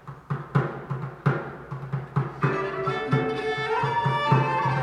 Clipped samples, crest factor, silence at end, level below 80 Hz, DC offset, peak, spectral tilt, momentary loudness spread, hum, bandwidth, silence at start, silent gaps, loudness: under 0.1%; 18 dB; 0 s; -56 dBFS; under 0.1%; -8 dBFS; -7.5 dB/octave; 12 LU; none; 9.2 kHz; 0.05 s; none; -26 LUFS